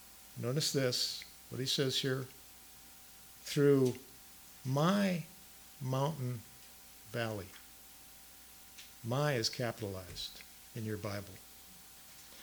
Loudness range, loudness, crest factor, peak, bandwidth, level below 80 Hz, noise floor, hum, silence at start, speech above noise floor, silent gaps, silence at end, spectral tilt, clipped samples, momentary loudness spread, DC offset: 7 LU; -35 LUFS; 20 dB; -16 dBFS; over 20 kHz; -68 dBFS; -56 dBFS; none; 0 s; 21 dB; none; 0 s; -4.5 dB/octave; under 0.1%; 21 LU; under 0.1%